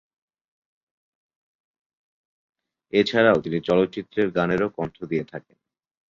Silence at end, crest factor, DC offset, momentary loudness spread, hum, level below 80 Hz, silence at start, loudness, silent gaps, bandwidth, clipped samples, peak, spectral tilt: 0.7 s; 22 dB; under 0.1%; 11 LU; none; -58 dBFS; 2.95 s; -23 LUFS; none; 7.4 kHz; under 0.1%; -4 dBFS; -7 dB/octave